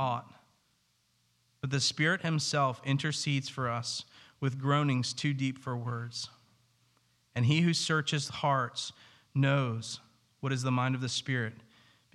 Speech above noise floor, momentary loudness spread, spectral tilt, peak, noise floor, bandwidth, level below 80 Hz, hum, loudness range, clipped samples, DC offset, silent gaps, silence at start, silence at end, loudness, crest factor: 42 dB; 12 LU; -4.5 dB/octave; -14 dBFS; -73 dBFS; 12 kHz; -74 dBFS; none; 3 LU; under 0.1%; under 0.1%; none; 0 s; 0.6 s; -31 LUFS; 18 dB